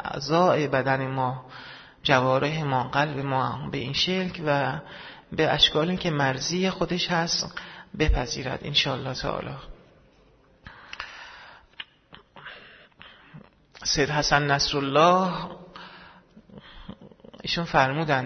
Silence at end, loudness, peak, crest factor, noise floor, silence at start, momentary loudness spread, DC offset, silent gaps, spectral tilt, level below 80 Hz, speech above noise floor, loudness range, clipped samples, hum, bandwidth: 0 s; -24 LUFS; -4 dBFS; 22 dB; -58 dBFS; 0 s; 22 LU; under 0.1%; none; -4 dB/octave; -42 dBFS; 34 dB; 16 LU; under 0.1%; none; 6.6 kHz